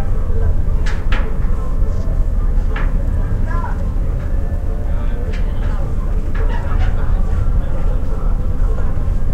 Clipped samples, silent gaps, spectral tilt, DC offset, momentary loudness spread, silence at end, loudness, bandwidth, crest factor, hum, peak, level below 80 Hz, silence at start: under 0.1%; none; -8 dB/octave; 0.6%; 3 LU; 0 s; -21 LUFS; 4.7 kHz; 12 dB; none; -2 dBFS; -16 dBFS; 0 s